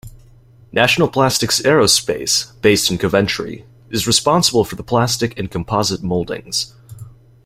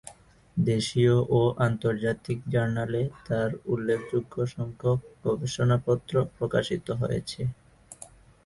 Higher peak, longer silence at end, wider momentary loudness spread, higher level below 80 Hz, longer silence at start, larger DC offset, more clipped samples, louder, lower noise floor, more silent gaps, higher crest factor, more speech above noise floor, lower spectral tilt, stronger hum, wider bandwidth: first, 0 dBFS vs -10 dBFS; about the same, 0.35 s vs 0.4 s; about the same, 10 LU vs 10 LU; first, -44 dBFS vs -54 dBFS; about the same, 0.05 s vs 0.05 s; neither; neither; first, -16 LUFS vs -27 LUFS; second, -46 dBFS vs -51 dBFS; neither; about the same, 18 dB vs 18 dB; first, 29 dB vs 24 dB; second, -3.5 dB/octave vs -6.5 dB/octave; neither; first, 16.5 kHz vs 11.5 kHz